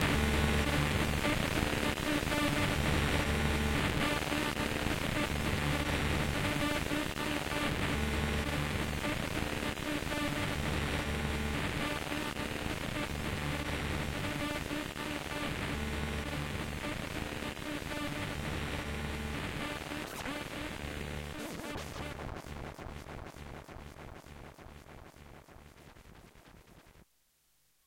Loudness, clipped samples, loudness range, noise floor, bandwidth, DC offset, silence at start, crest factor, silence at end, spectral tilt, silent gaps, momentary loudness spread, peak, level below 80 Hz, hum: -34 LUFS; under 0.1%; 15 LU; -73 dBFS; 16.5 kHz; under 0.1%; 0 s; 24 dB; 0.85 s; -4.5 dB/octave; none; 15 LU; -12 dBFS; -42 dBFS; none